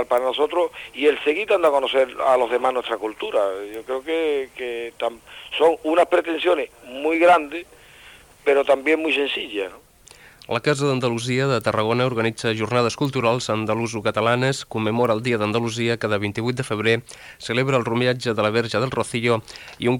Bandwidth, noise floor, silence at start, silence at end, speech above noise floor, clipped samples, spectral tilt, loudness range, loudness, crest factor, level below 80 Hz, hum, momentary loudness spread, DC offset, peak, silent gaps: 18.5 kHz; -48 dBFS; 0 s; 0 s; 27 dB; under 0.1%; -5.5 dB/octave; 2 LU; -21 LUFS; 16 dB; -58 dBFS; none; 10 LU; under 0.1%; -4 dBFS; none